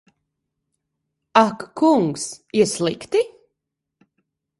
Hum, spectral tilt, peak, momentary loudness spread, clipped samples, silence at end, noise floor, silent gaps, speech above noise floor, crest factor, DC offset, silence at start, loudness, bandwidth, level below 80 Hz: none; -4.5 dB/octave; 0 dBFS; 7 LU; under 0.1%; 1.3 s; -81 dBFS; none; 62 dB; 22 dB; under 0.1%; 1.35 s; -20 LUFS; 11.5 kHz; -64 dBFS